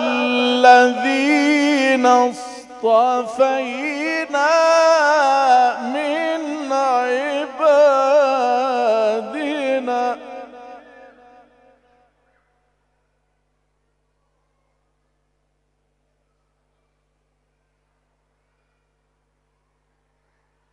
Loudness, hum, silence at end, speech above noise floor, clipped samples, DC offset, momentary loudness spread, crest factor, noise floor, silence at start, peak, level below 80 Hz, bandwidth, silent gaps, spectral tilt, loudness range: -16 LUFS; 50 Hz at -70 dBFS; 9.95 s; 53 dB; under 0.1%; under 0.1%; 10 LU; 20 dB; -68 dBFS; 0 s; 0 dBFS; -70 dBFS; 11.5 kHz; none; -2.5 dB/octave; 11 LU